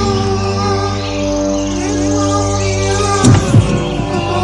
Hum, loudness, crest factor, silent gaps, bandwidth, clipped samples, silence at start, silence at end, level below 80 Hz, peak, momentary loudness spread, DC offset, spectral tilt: none; -14 LUFS; 14 dB; none; 11.5 kHz; under 0.1%; 0 s; 0 s; -28 dBFS; 0 dBFS; 7 LU; under 0.1%; -5.5 dB/octave